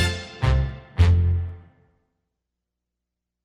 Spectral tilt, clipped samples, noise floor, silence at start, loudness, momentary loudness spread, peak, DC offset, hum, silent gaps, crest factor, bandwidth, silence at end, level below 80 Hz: -6 dB/octave; under 0.1%; -84 dBFS; 0 s; -22 LUFS; 10 LU; -6 dBFS; under 0.1%; 60 Hz at -65 dBFS; none; 18 dB; 10.5 kHz; 1.85 s; -30 dBFS